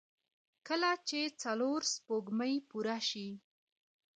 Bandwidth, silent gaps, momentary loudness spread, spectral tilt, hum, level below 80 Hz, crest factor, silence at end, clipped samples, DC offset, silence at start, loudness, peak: 9.4 kHz; none; 6 LU; -2.5 dB/octave; none; -88 dBFS; 18 dB; 0.75 s; under 0.1%; under 0.1%; 0.65 s; -36 LUFS; -20 dBFS